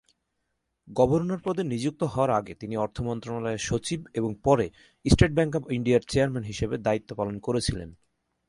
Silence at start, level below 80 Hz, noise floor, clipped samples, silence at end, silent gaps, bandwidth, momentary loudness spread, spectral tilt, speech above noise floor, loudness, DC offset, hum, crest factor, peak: 0.85 s; -42 dBFS; -78 dBFS; under 0.1%; 0.55 s; none; 11.5 kHz; 9 LU; -6 dB/octave; 52 dB; -27 LUFS; under 0.1%; none; 22 dB; -4 dBFS